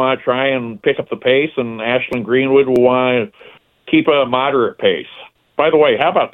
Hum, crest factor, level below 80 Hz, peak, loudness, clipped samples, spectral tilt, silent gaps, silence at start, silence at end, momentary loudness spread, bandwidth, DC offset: none; 16 dB; -56 dBFS; 0 dBFS; -15 LUFS; under 0.1%; -7.5 dB/octave; none; 0 s; 0.05 s; 7 LU; 4.3 kHz; under 0.1%